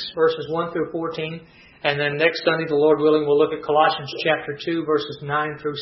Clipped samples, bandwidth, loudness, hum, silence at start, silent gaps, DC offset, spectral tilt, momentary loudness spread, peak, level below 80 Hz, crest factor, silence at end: under 0.1%; 6 kHz; -21 LUFS; none; 0 s; none; under 0.1%; -7 dB/octave; 9 LU; -2 dBFS; -62 dBFS; 18 dB; 0 s